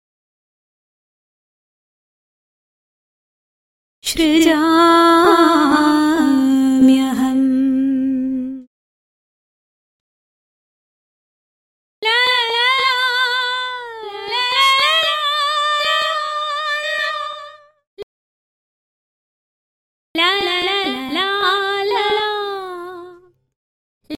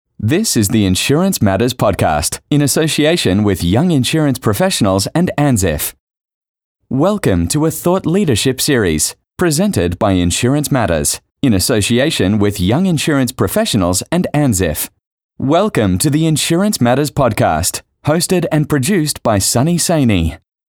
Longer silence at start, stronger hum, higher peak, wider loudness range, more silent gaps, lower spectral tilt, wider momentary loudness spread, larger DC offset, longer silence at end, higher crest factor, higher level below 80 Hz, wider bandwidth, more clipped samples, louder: first, 4.05 s vs 0.2 s; neither; about the same, 0 dBFS vs -2 dBFS; first, 12 LU vs 2 LU; first, 8.67-12.02 s, 17.87-17.97 s, 18.03-20.15 s, 23.56-24.01 s vs 6.00-6.07 s, 6.34-6.41 s, 6.48-6.54 s, 6.64-6.75 s, 15.07-15.18 s, 15.24-15.29 s; second, -2.5 dB/octave vs -5 dB/octave; first, 14 LU vs 4 LU; neither; second, 0 s vs 0.35 s; first, 18 dB vs 10 dB; second, -54 dBFS vs -36 dBFS; second, 16.5 kHz vs over 20 kHz; neither; about the same, -15 LUFS vs -14 LUFS